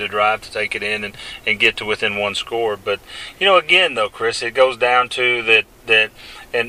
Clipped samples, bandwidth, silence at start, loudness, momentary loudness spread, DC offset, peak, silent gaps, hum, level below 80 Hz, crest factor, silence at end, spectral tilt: under 0.1%; 15.5 kHz; 0 s; -17 LUFS; 11 LU; under 0.1%; 0 dBFS; none; none; -52 dBFS; 18 dB; 0 s; -2.5 dB/octave